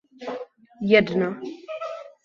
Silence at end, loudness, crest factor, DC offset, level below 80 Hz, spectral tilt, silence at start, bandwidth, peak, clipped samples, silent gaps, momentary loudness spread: 0.15 s; -23 LUFS; 22 dB; under 0.1%; -62 dBFS; -7 dB/octave; 0.2 s; 7.2 kHz; -2 dBFS; under 0.1%; none; 17 LU